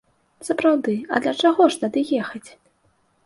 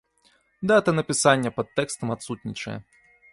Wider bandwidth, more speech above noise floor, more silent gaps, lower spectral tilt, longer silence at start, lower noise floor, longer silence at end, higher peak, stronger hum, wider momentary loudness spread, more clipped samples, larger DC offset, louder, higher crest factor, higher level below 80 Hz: about the same, 11.5 kHz vs 11.5 kHz; first, 44 dB vs 40 dB; neither; about the same, -4.5 dB/octave vs -4.5 dB/octave; second, 0.4 s vs 0.6 s; about the same, -64 dBFS vs -64 dBFS; first, 0.75 s vs 0.5 s; about the same, -4 dBFS vs -6 dBFS; neither; about the same, 15 LU vs 14 LU; neither; neither; first, -20 LUFS vs -24 LUFS; about the same, 18 dB vs 20 dB; second, -66 dBFS vs -60 dBFS